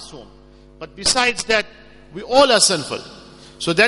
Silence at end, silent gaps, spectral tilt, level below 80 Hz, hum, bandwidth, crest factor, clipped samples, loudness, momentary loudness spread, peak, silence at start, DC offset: 0 s; none; -1.5 dB/octave; -48 dBFS; none; 11.5 kHz; 20 dB; under 0.1%; -16 LUFS; 25 LU; 0 dBFS; 0 s; under 0.1%